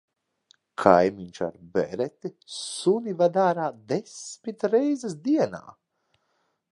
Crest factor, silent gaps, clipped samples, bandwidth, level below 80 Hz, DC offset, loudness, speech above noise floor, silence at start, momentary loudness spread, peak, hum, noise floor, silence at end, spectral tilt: 24 dB; none; under 0.1%; 11.5 kHz; -64 dBFS; under 0.1%; -25 LUFS; 48 dB; 0.8 s; 16 LU; -2 dBFS; none; -73 dBFS; 1 s; -5.5 dB/octave